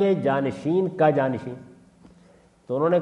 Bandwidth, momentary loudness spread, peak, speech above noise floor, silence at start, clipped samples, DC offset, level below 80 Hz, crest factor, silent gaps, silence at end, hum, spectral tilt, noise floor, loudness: 9.8 kHz; 13 LU; -6 dBFS; 33 dB; 0 s; under 0.1%; under 0.1%; -66 dBFS; 18 dB; none; 0 s; none; -8.5 dB/octave; -55 dBFS; -23 LUFS